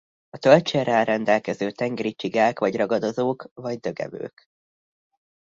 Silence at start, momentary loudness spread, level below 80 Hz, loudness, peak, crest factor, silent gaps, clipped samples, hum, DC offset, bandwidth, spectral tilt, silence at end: 0.35 s; 14 LU; -66 dBFS; -23 LUFS; 0 dBFS; 22 dB; 3.51-3.56 s; under 0.1%; none; under 0.1%; 7.6 kHz; -6 dB/octave; 1.3 s